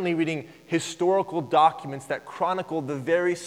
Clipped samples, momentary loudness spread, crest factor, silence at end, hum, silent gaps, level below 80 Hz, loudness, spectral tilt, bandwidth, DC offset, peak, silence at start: under 0.1%; 12 LU; 18 dB; 0 s; none; none; -72 dBFS; -25 LUFS; -5 dB/octave; 13.5 kHz; under 0.1%; -8 dBFS; 0 s